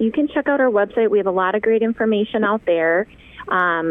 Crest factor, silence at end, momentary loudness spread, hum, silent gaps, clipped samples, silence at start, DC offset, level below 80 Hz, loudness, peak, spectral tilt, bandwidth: 12 dB; 0 s; 4 LU; none; none; under 0.1%; 0 s; under 0.1%; -54 dBFS; -18 LUFS; -6 dBFS; -8.5 dB/octave; 3.9 kHz